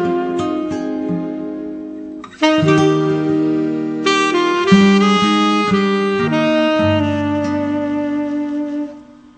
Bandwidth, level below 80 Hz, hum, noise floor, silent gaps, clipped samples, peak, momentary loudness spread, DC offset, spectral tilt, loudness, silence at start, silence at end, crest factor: 8.8 kHz; -54 dBFS; none; -37 dBFS; none; under 0.1%; 0 dBFS; 13 LU; under 0.1%; -6 dB/octave; -16 LUFS; 0 s; 0.25 s; 16 dB